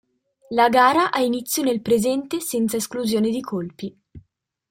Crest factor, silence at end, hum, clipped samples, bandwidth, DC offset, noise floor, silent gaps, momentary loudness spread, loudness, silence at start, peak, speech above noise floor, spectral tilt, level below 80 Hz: 18 dB; 0.5 s; none; under 0.1%; 16.5 kHz; under 0.1%; -64 dBFS; none; 13 LU; -21 LUFS; 0.5 s; -4 dBFS; 44 dB; -4 dB/octave; -60 dBFS